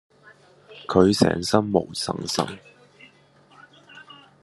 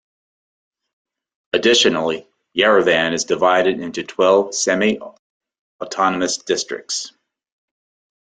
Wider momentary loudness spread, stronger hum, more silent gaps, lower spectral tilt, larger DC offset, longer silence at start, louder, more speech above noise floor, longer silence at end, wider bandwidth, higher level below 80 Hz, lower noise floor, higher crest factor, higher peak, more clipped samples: first, 24 LU vs 12 LU; neither; second, none vs 5.19-5.40 s, 5.59-5.79 s; first, -5 dB/octave vs -2.5 dB/octave; neither; second, 0.7 s vs 1.55 s; second, -22 LUFS vs -17 LUFS; second, 34 dB vs over 73 dB; second, 0.4 s vs 1.25 s; first, 12.5 kHz vs 9.6 kHz; about the same, -60 dBFS vs -60 dBFS; second, -55 dBFS vs under -90 dBFS; first, 24 dB vs 18 dB; about the same, 0 dBFS vs -2 dBFS; neither